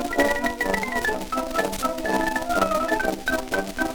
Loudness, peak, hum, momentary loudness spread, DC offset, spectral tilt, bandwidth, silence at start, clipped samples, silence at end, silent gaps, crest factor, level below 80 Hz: -24 LUFS; -6 dBFS; none; 4 LU; under 0.1%; -3.5 dB/octave; over 20 kHz; 0 s; under 0.1%; 0 s; none; 18 dB; -40 dBFS